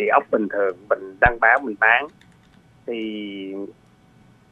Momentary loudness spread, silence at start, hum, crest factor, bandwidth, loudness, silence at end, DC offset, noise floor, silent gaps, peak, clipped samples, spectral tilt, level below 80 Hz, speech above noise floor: 17 LU; 0 s; none; 22 dB; 8 kHz; -20 LUFS; 0.8 s; under 0.1%; -53 dBFS; none; 0 dBFS; under 0.1%; -7 dB/octave; -44 dBFS; 32 dB